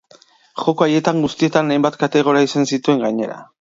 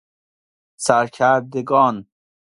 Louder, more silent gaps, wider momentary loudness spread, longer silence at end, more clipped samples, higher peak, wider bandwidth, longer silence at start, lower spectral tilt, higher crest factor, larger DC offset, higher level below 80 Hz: about the same, -17 LUFS vs -18 LUFS; neither; about the same, 7 LU vs 6 LU; second, 0.15 s vs 0.5 s; neither; about the same, 0 dBFS vs 0 dBFS; second, 7.8 kHz vs 11.5 kHz; second, 0.55 s vs 0.8 s; about the same, -5.5 dB/octave vs -4.5 dB/octave; about the same, 16 dB vs 20 dB; neither; about the same, -62 dBFS vs -64 dBFS